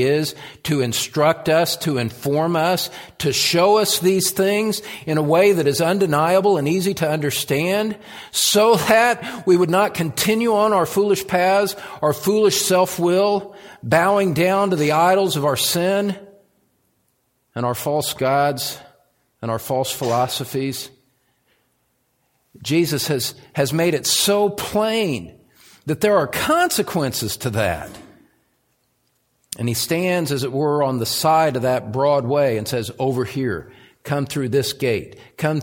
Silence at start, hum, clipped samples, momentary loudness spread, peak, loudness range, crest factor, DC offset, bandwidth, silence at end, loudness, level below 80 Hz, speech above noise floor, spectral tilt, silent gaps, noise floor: 0 s; none; under 0.1%; 10 LU; -2 dBFS; 7 LU; 18 dB; under 0.1%; 17 kHz; 0 s; -19 LUFS; -56 dBFS; 48 dB; -4 dB/octave; none; -67 dBFS